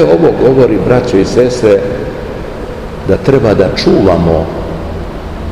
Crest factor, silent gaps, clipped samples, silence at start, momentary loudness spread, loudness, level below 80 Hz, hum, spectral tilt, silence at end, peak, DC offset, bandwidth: 10 dB; none; 2%; 0 s; 14 LU; -10 LUFS; -26 dBFS; none; -7 dB/octave; 0 s; 0 dBFS; 1%; 12 kHz